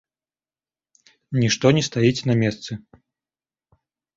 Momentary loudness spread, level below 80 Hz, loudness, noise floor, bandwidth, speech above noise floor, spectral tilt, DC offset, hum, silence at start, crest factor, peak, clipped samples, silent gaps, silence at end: 16 LU; -56 dBFS; -20 LUFS; under -90 dBFS; 7.8 kHz; over 70 dB; -5.5 dB/octave; under 0.1%; none; 1.3 s; 22 dB; -2 dBFS; under 0.1%; none; 1.4 s